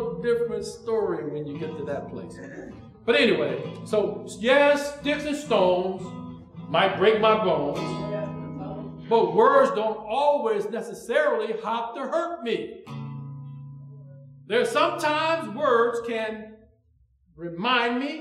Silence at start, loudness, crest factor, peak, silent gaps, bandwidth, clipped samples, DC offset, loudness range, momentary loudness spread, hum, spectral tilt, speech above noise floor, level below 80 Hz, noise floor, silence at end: 0 s; -24 LUFS; 18 dB; -6 dBFS; none; 13.5 kHz; under 0.1%; under 0.1%; 6 LU; 18 LU; none; -5 dB/octave; 39 dB; -60 dBFS; -63 dBFS; 0 s